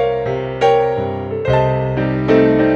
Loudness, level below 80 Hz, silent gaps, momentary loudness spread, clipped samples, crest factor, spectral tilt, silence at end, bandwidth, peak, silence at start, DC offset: -16 LUFS; -36 dBFS; none; 9 LU; under 0.1%; 14 dB; -8 dB/octave; 0 s; 7.4 kHz; -2 dBFS; 0 s; under 0.1%